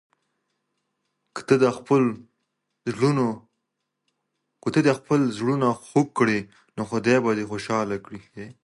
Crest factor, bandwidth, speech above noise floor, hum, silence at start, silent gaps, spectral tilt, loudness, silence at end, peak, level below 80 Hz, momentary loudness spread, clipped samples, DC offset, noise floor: 22 dB; 11.5 kHz; 57 dB; none; 1.35 s; none; -6.5 dB/octave; -23 LUFS; 0.1 s; -4 dBFS; -64 dBFS; 18 LU; under 0.1%; under 0.1%; -80 dBFS